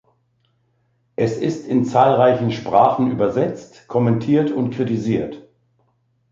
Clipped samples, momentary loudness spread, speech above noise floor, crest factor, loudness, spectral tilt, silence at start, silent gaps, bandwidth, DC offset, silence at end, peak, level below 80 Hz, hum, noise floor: under 0.1%; 9 LU; 47 dB; 18 dB; -18 LUFS; -8 dB/octave; 1.2 s; none; 7.6 kHz; under 0.1%; 0.9 s; -2 dBFS; -56 dBFS; none; -65 dBFS